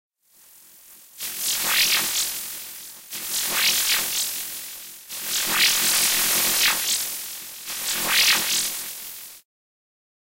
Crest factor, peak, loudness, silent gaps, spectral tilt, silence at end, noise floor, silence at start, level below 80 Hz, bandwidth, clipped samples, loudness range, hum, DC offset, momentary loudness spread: 18 dB; -6 dBFS; -20 LUFS; none; 1.5 dB/octave; 0.95 s; -54 dBFS; 0.85 s; -62 dBFS; 16 kHz; under 0.1%; 4 LU; none; under 0.1%; 17 LU